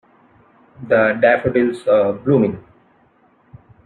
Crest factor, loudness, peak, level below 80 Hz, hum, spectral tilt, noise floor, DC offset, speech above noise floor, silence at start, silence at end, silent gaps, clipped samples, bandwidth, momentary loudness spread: 16 dB; -16 LUFS; -2 dBFS; -56 dBFS; none; -8 dB/octave; -56 dBFS; under 0.1%; 40 dB; 0.8 s; 1.25 s; none; under 0.1%; 9.8 kHz; 7 LU